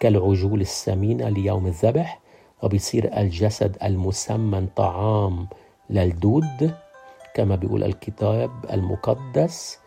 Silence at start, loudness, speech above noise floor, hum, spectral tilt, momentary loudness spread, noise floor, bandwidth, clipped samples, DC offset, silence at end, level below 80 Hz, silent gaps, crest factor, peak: 0 s; -23 LUFS; 25 dB; none; -7 dB/octave; 6 LU; -46 dBFS; 14.5 kHz; under 0.1%; under 0.1%; 0.1 s; -50 dBFS; none; 18 dB; -4 dBFS